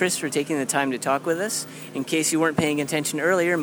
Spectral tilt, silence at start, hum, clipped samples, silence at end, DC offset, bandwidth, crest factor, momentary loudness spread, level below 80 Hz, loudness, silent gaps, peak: -3.5 dB/octave; 0 s; none; under 0.1%; 0 s; under 0.1%; over 20 kHz; 20 dB; 6 LU; -64 dBFS; -23 LUFS; none; -4 dBFS